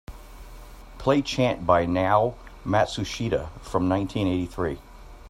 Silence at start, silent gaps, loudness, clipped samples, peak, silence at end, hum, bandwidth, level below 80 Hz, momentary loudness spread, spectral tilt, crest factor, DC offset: 0.1 s; none; -25 LUFS; under 0.1%; -4 dBFS; 0 s; none; 14.5 kHz; -44 dBFS; 9 LU; -6 dB/octave; 20 dB; under 0.1%